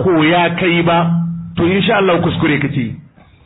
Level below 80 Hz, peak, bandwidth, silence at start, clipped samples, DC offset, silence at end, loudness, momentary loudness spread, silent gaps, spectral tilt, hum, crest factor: -44 dBFS; -2 dBFS; 4 kHz; 0 s; under 0.1%; under 0.1%; 0.45 s; -14 LUFS; 9 LU; none; -12 dB/octave; none; 12 dB